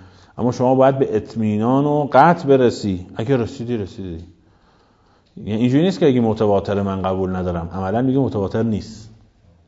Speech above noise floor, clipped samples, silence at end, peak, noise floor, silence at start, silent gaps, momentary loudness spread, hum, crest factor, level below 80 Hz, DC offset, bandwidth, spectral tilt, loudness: 38 dB; under 0.1%; 0.6 s; 0 dBFS; -56 dBFS; 0 s; none; 11 LU; none; 18 dB; -48 dBFS; under 0.1%; 7.8 kHz; -8 dB/octave; -18 LUFS